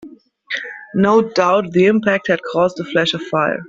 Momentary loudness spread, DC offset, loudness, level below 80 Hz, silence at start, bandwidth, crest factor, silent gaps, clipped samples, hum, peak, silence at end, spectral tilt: 11 LU; under 0.1%; -16 LUFS; -58 dBFS; 0 s; 7.8 kHz; 16 dB; none; under 0.1%; none; 0 dBFS; 0 s; -6 dB/octave